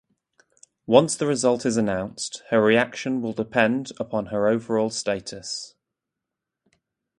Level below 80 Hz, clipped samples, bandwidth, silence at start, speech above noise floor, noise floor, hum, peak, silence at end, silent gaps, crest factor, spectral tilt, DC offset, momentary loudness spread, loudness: -60 dBFS; under 0.1%; 11.5 kHz; 0.9 s; 62 dB; -85 dBFS; none; 0 dBFS; 1.5 s; none; 24 dB; -4.5 dB/octave; under 0.1%; 13 LU; -23 LUFS